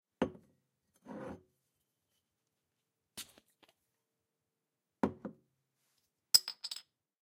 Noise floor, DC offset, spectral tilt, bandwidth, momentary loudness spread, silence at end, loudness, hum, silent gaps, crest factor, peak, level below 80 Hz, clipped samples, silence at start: -88 dBFS; under 0.1%; -2 dB/octave; 16 kHz; 24 LU; 0.5 s; -33 LUFS; none; none; 36 dB; -6 dBFS; -74 dBFS; under 0.1%; 0.2 s